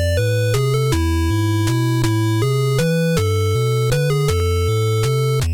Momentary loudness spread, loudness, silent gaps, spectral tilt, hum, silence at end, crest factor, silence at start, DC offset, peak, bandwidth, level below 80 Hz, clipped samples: 1 LU; -18 LUFS; none; -6 dB/octave; none; 0 s; 10 dB; 0 s; under 0.1%; -6 dBFS; 18.5 kHz; -32 dBFS; under 0.1%